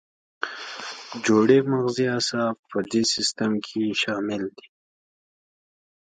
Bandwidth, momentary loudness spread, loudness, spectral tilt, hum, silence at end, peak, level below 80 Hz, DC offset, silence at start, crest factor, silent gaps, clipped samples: 9.4 kHz; 15 LU; -24 LUFS; -4 dB/octave; none; 1.55 s; -6 dBFS; -68 dBFS; under 0.1%; 0.4 s; 20 dB; 2.59-2.63 s; under 0.1%